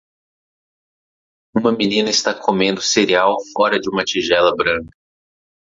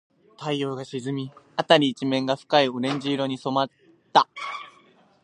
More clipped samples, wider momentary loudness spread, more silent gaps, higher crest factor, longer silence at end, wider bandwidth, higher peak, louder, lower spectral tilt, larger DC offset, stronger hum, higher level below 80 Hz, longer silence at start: neither; second, 5 LU vs 13 LU; neither; second, 16 dB vs 24 dB; first, 0.85 s vs 0.55 s; second, 7.8 kHz vs 10.5 kHz; about the same, -2 dBFS vs -2 dBFS; first, -17 LUFS vs -24 LUFS; second, -3 dB/octave vs -5 dB/octave; neither; neither; first, -54 dBFS vs -76 dBFS; first, 1.55 s vs 0.4 s